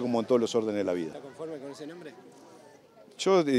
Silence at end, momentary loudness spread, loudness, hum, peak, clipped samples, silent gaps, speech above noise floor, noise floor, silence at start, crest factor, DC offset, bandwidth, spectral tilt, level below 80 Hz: 0 s; 17 LU; -29 LUFS; none; -12 dBFS; under 0.1%; none; 26 dB; -55 dBFS; 0 s; 18 dB; under 0.1%; 12.5 kHz; -5 dB/octave; -80 dBFS